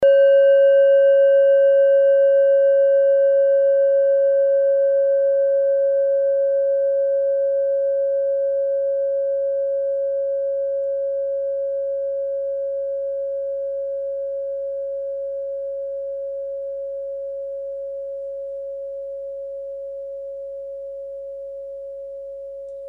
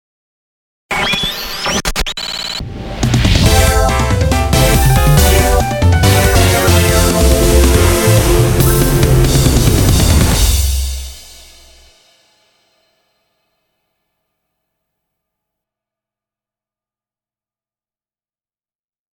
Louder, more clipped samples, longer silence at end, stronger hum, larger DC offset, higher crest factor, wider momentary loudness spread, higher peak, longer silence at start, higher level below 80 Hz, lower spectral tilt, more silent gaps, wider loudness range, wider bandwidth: second, -19 LUFS vs -12 LUFS; neither; second, 0 s vs 7.9 s; neither; neither; about the same, 12 dB vs 14 dB; first, 18 LU vs 9 LU; second, -8 dBFS vs 0 dBFS; second, 0 s vs 0.9 s; second, -62 dBFS vs -18 dBFS; about the same, -4.5 dB/octave vs -4.5 dB/octave; neither; first, 16 LU vs 7 LU; second, 3 kHz vs 19 kHz